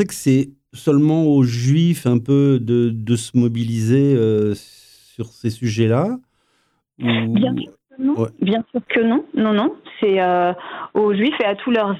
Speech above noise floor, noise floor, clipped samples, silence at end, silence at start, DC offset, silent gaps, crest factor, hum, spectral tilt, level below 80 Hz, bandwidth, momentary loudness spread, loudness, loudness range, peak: 48 dB; -65 dBFS; under 0.1%; 0 s; 0 s; under 0.1%; none; 14 dB; none; -7 dB/octave; -60 dBFS; 14.5 kHz; 9 LU; -18 LUFS; 5 LU; -4 dBFS